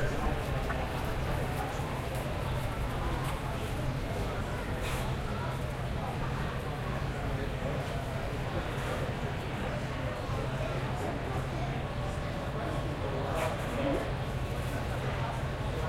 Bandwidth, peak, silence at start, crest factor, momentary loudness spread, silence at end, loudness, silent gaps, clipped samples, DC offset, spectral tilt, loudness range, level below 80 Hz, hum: 16.5 kHz; -20 dBFS; 0 s; 14 dB; 3 LU; 0 s; -34 LUFS; none; under 0.1%; under 0.1%; -6 dB/octave; 1 LU; -40 dBFS; none